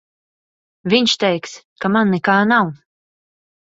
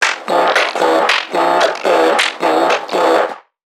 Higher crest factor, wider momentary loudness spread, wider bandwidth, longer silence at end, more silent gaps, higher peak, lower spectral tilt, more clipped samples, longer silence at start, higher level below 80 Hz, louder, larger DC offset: about the same, 18 dB vs 14 dB; first, 11 LU vs 3 LU; second, 7.8 kHz vs 16.5 kHz; first, 0.85 s vs 0.4 s; first, 1.64-1.76 s vs none; about the same, 0 dBFS vs 0 dBFS; first, -4.5 dB/octave vs -2 dB/octave; neither; first, 0.85 s vs 0 s; first, -62 dBFS vs -70 dBFS; about the same, -16 LUFS vs -14 LUFS; neither